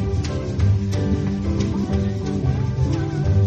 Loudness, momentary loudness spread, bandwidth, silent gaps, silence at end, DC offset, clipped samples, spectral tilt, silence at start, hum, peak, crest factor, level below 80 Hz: -22 LUFS; 3 LU; 8.2 kHz; none; 0 s; under 0.1%; under 0.1%; -8 dB/octave; 0 s; none; -8 dBFS; 12 dB; -32 dBFS